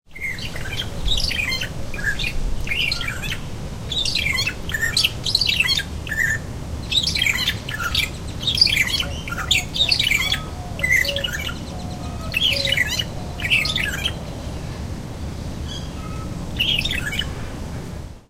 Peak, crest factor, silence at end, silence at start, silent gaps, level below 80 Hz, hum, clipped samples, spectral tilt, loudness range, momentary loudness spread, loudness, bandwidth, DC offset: 0 dBFS; 22 dB; 0.1 s; 0.1 s; none; -32 dBFS; none; under 0.1%; -2.5 dB/octave; 7 LU; 14 LU; -21 LUFS; 16 kHz; under 0.1%